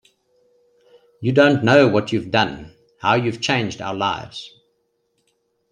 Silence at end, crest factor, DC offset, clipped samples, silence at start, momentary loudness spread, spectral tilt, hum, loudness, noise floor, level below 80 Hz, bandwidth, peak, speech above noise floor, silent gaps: 1.25 s; 20 dB; under 0.1%; under 0.1%; 1.2 s; 18 LU; -5.5 dB/octave; none; -18 LUFS; -69 dBFS; -56 dBFS; 10 kHz; -2 dBFS; 51 dB; none